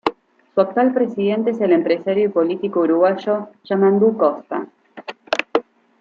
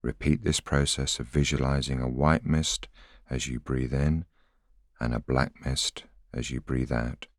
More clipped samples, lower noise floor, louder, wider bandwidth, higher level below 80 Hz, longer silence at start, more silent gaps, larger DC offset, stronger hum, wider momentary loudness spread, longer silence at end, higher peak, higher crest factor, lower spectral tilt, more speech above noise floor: neither; second, -37 dBFS vs -63 dBFS; first, -19 LUFS vs -28 LUFS; second, 7.4 kHz vs 14 kHz; second, -68 dBFS vs -38 dBFS; about the same, 0.05 s vs 0.05 s; neither; neither; neither; first, 12 LU vs 9 LU; first, 0.4 s vs 0.15 s; first, 0 dBFS vs -6 dBFS; about the same, 18 dB vs 22 dB; first, -7.5 dB/octave vs -4.5 dB/octave; second, 19 dB vs 35 dB